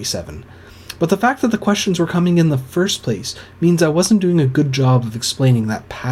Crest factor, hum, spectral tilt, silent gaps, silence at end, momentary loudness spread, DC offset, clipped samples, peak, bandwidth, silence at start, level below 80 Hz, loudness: 14 dB; none; -5.5 dB/octave; none; 0 s; 10 LU; under 0.1%; under 0.1%; -2 dBFS; 15 kHz; 0 s; -48 dBFS; -17 LUFS